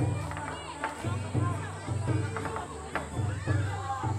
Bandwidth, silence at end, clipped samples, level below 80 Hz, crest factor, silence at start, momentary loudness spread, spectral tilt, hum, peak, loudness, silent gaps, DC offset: 12 kHz; 0 s; under 0.1%; -50 dBFS; 18 dB; 0 s; 6 LU; -6 dB/octave; none; -14 dBFS; -33 LUFS; none; under 0.1%